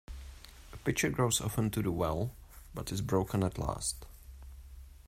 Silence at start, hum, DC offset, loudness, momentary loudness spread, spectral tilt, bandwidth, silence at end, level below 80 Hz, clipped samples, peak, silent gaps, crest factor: 0.1 s; none; under 0.1%; -33 LUFS; 22 LU; -4.5 dB/octave; 16 kHz; 0 s; -48 dBFS; under 0.1%; -16 dBFS; none; 20 dB